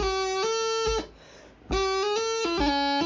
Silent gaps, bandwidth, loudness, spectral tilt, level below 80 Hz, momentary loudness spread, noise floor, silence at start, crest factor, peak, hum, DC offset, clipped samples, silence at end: none; 7.6 kHz; -26 LUFS; -3 dB/octave; -42 dBFS; 6 LU; -50 dBFS; 0 s; 14 dB; -12 dBFS; none; under 0.1%; under 0.1%; 0 s